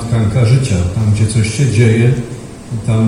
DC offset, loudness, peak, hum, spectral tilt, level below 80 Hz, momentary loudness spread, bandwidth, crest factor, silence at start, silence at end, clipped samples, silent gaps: under 0.1%; -13 LUFS; 0 dBFS; none; -6.5 dB/octave; -36 dBFS; 12 LU; 11.5 kHz; 12 dB; 0 s; 0 s; under 0.1%; none